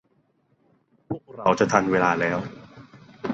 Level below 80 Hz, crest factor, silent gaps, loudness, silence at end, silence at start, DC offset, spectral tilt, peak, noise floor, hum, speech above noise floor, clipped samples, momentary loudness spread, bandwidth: -58 dBFS; 24 dB; none; -23 LUFS; 0 s; 1.1 s; under 0.1%; -5.5 dB/octave; -2 dBFS; -66 dBFS; none; 45 dB; under 0.1%; 16 LU; 8.2 kHz